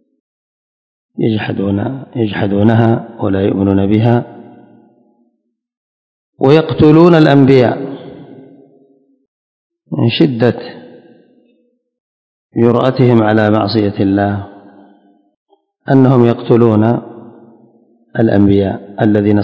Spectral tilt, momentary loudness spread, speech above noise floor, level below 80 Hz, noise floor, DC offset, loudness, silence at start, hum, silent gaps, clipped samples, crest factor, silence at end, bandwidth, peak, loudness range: -9.5 dB/octave; 16 LU; 54 dB; -42 dBFS; -65 dBFS; under 0.1%; -12 LUFS; 1.15 s; none; 5.77-6.33 s, 9.28-9.70 s, 12.00-12.49 s, 15.36-15.46 s; 0.8%; 14 dB; 0 s; 8 kHz; 0 dBFS; 8 LU